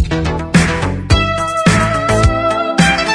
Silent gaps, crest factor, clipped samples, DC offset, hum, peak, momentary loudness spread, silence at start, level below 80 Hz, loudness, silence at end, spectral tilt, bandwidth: none; 12 dB; under 0.1%; under 0.1%; none; 0 dBFS; 4 LU; 0 s; -22 dBFS; -13 LUFS; 0 s; -5 dB/octave; 10.5 kHz